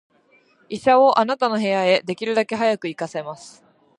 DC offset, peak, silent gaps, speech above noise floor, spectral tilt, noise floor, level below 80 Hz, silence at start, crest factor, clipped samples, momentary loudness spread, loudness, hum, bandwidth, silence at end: under 0.1%; -4 dBFS; none; 39 dB; -5 dB/octave; -58 dBFS; -68 dBFS; 0.7 s; 18 dB; under 0.1%; 16 LU; -19 LUFS; none; 11 kHz; 0.5 s